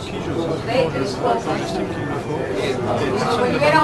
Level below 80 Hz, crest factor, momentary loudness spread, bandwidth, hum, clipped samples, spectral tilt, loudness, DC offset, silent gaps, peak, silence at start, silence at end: -44 dBFS; 18 dB; 6 LU; 12.5 kHz; none; under 0.1%; -5.5 dB/octave; -21 LUFS; 0.1%; none; -2 dBFS; 0 s; 0 s